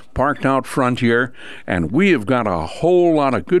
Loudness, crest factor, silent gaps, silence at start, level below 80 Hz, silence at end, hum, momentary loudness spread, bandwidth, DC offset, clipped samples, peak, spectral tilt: -17 LUFS; 14 dB; none; 0.15 s; -42 dBFS; 0 s; none; 7 LU; 12.5 kHz; 1%; under 0.1%; -2 dBFS; -7 dB/octave